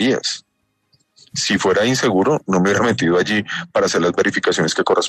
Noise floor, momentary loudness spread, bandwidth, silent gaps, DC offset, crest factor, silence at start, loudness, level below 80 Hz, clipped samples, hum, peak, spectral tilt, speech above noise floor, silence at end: -64 dBFS; 6 LU; 13.5 kHz; none; under 0.1%; 14 dB; 0 s; -17 LUFS; -54 dBFS; under 0.1%; none; -4 dBFS; -4 dB/octave; 47 dB; 0 s